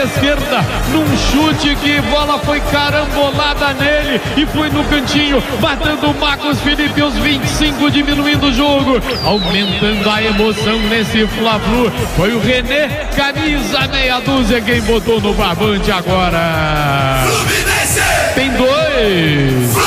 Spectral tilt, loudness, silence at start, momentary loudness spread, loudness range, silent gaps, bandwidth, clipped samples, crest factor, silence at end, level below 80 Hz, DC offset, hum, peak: -4.5 dB/octave; -13 LUFS; 0 s; 3 LU; 1 LU; none; 16 kHz; under 0.1%; 12 dB; 0 s; -24 dBFS; under 0.1%; none; 0 dBFS